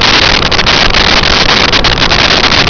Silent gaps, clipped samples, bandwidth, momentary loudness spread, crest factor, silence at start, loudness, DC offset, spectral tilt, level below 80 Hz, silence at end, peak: none; under 0.1%; 5.4 kHz; 2 LU; 6 dB; 0 s; -5 LUFS; under 0.1%; -3 dB/octave; -18 dBFS; 0 s; 0 dBFS